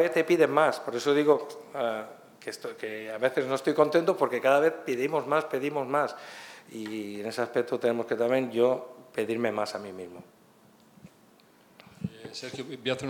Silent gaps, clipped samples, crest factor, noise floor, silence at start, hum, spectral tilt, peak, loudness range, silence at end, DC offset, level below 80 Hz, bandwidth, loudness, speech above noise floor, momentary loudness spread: none; under 0.1%; 22 dB; -59 dBFS; 0 s; none; -5 dB/octave; -6 dBFS; 9 LU; 0 s; under 0.1%; -76 dBFS; 19 kHz; -28 LUFS; 31 dB; 16 LU